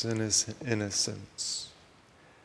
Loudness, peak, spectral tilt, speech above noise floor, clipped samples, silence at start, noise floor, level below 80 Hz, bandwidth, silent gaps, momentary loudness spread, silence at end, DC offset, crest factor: -30 LUFS; -12 dBFS; -2.5 dB/octave; 26 dB; under 0.1%; 0 s; -58 dBFS; -66 dBFS; 11 kHz; none; 9 LU; 0.7 s; under 0.1%; 20 dB